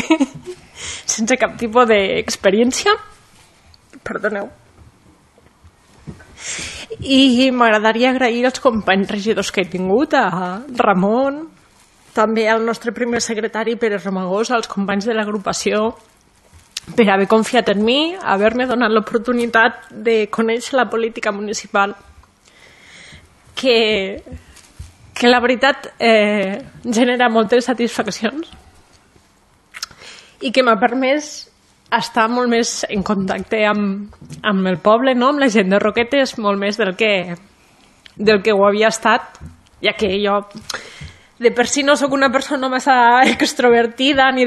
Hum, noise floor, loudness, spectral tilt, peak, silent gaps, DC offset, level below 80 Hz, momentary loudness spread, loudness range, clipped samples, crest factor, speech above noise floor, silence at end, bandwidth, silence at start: none; -54 dBFS; -16 LUFS; -4 dB/octave; 0 dBFS; none; under 0.1%; -50 dBFS; 14 LU; 5 LU; under 0.1%; 18 dB; 38 dB; 0 s; 12.5 kHz; 0 s